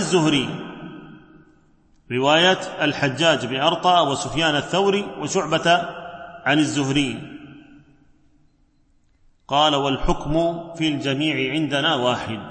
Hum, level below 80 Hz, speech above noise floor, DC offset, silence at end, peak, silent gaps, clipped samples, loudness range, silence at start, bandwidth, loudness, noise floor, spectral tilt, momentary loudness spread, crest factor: none; -42 dBFS; 39 dB; under 0.1%; 0 s; -2 dBFS; none; under 0.1%; 6 LU; 0 s; 8.8 kHz; -20 LUFS; -59 dBFS; -4 dB/octave; 15 LU; 18 dB